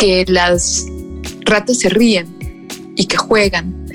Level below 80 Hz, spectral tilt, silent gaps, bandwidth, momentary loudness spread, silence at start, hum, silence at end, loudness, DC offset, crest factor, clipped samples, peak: -32 dBFS; -3.5 dB/octave; none; 17.5 kHz; 17 LU; 0 s; none; 0 s; -14 LUFS; under 0.1%; 12 dB; under 0.1%; -2 dBFS